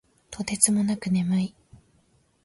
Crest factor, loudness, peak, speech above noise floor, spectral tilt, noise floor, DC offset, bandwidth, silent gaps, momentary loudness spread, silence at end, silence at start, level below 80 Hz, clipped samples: 24 dB; -24 LUFS; -4 dBFS; 40 dB; -4.5 dB/octave; -64 dBFS; under 0.1%; 12 kHz; none; 14 LU; 0.95 s; 0.3 s; -58 dBFS; under 0.1%